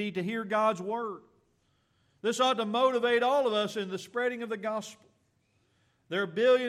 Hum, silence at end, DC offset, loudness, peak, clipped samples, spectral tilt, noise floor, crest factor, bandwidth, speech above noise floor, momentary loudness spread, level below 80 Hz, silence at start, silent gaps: none; 0 s; under 0.1%; -29 LUFS; -14 dBFS; under 0.1%; -4 dB/octave; -72 dBFS; 16 dB; 13.5 kHz; 43 dB; 10 LU; -82 dBFS; 0 s; none